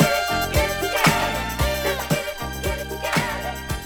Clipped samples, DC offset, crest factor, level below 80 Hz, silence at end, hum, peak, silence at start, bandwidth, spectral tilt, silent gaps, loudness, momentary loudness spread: under 0.1%; under 0.1%; 20 dB; -34 dBFS; 0 s; none; -2 dBFS; 0 s; over 20 kHz; -4 dB/octave; none; -22 LUFS; 9 LU